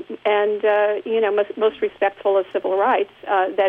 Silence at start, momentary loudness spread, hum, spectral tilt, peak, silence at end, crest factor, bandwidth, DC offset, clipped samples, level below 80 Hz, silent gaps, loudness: 0 s; 4 LU; none; -6 dB/octave; -8 dBFS; 0 s; 12 dB; 4 kHz; under 0.1%; under 0.1%; -68 dBFS; none; -20 LUFS